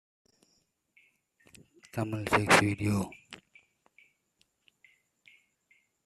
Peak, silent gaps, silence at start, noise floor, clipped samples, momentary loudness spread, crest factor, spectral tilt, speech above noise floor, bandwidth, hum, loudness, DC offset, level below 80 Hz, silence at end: -8 dBFS; none; 1.95 s; -74 dBFS; under 0.1%; 27 LU; 26 dB; -4.5 dB/octave; 47 dB; 14 kHz; none; -28 LUFS; under 0.1%; -62 dBFS; 2.7 s